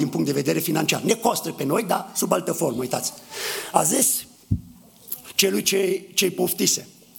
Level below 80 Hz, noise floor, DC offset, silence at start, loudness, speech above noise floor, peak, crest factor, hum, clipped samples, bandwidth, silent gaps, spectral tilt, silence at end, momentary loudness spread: -50 dBFS; -46 dBFS; under 0.1%; 0 s; -22 LUFS; 24 dB; -2 dBFS; 22 dB; none; under 0.1%; 19 kHz; none; -3 dB/octave; 0.3 s; 10 LU